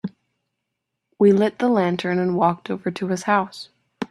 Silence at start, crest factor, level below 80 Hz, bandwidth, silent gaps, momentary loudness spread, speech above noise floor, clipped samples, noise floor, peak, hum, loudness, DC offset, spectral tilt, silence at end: 0.05 s; 18 dB; -66 dBFS; 12 kHz; none; 17 LU; 60 dB; under 0.1%; -80 dBFS; -4 dBFS; none; -20 LUFS; under 0.1%; -6.5 dB/octave; 0.05 s